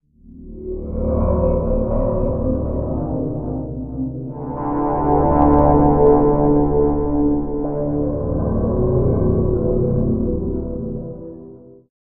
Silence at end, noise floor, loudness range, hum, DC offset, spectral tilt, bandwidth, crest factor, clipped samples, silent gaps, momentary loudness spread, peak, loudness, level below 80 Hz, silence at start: 0.25 s; -40 dBFS; 6 LU; none; under 0.1%; -13 dB/octave; 2.6 kHz; 18 dB; under 0.1%; none; 14 LU; 0 dBFS; -19 LUFS; -26 dBFS; 0.25 s